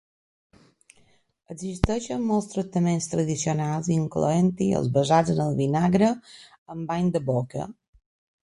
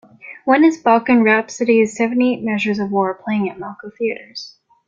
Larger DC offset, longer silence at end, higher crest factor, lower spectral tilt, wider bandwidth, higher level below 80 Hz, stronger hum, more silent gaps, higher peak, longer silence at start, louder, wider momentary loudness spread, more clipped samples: neither; first, 0.75 s vs 0.4 s; first, 24 dB vs 16 dB; about the same, -6.5 dB/octave vs -5.5 dB/octave; first, 11.5 kHz vs 7.8 kHz; first, -46 dBFS vs -62 dBFS; neither; first, 6.58-6.66 s vs none; about the same, -2 dBFS vs -2 dBFS; first, 1.5 s vs 0.25 s; second, -24 LUFS vs -17 LUFS; second, 14 LU vs 18 LU; neither